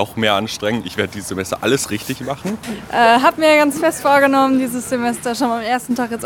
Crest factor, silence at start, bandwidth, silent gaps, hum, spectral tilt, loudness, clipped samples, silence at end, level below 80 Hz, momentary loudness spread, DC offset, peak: 16 dB; 0 s; 18 kHz; none; none; -4 dB/octave; -17 LUFS; under 0.1%; 0 s; -52 dBFS; 12 LU; under 0.1%; 0 dBFS